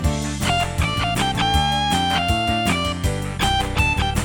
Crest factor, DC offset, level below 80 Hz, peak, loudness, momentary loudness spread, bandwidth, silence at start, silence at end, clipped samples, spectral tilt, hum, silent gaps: 14 dB; under 0.1%; -28 dBFS; -6 dBFS; -20 LUFS; 4 LU; 18 kHz; 0 s; 0 s; under 0.1%; -4 dB/octave; none; none